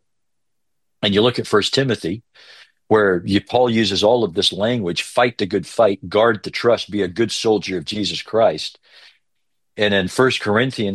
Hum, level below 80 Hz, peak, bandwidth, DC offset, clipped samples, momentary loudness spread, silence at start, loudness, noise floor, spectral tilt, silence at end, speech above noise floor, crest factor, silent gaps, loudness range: none; -58 dBFS; -2 dBFS; 12.5 kHz; under 0.1%; under 0.1%; 7 LU; 1 s; -18 LUFS; -80 dBFS; -4.5 dB/octave; 0 s; 62 dB; 18 dB; none; 3 LU